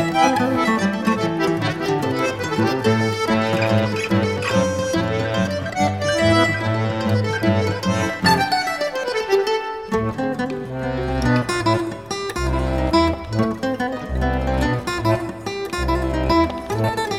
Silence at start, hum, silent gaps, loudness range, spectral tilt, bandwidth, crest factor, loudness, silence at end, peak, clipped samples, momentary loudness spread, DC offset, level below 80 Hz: 0 s; none; none; 3 LU; -5.5 dB/octave; 16 kHz; 18 dB; -20 LUFS; 0 s; -2 dBFS; under 0.1%; 6 LU; 0.2%; -34 dBFS